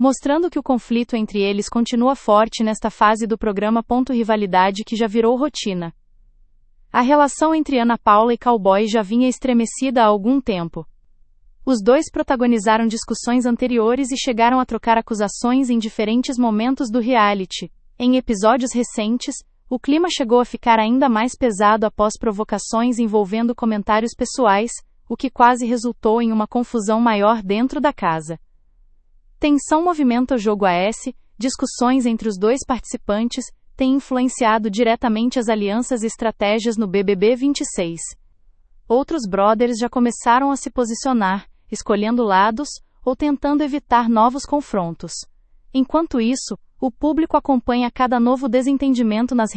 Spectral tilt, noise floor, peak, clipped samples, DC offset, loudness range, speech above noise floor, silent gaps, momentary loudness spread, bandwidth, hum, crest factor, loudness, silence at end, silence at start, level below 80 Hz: -4.5 dB/octave; -52 dBFS; 0 dBFS; under 0.1%; under 0.1%; 3 LU; 34 dB; none; 9 LU; 8.8 kHz; none; 18 dB; -18 LUFS; 0 s; 0 s; -46 dBFS